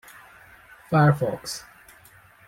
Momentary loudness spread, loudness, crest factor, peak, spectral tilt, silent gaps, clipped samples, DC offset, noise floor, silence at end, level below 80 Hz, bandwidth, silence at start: 15 LU; -23 LUFS; 20 dB; -6 dBFS; -6.5 dB/octave; none; under 0.1%; under 0.1%; -53 dBFS; 0.85 s; -58 dBFS; 16 kHz; 0.9 s